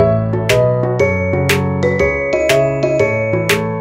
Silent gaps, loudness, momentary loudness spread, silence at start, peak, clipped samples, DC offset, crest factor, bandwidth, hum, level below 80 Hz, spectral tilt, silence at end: none; -14 LUFS; 2 LU; 0 s; 0 dBFS; under 0.1%; under 0.1%; 14 dB; 16 kHz; none; -36 dBFS; -5.5 dB/octave; 0 s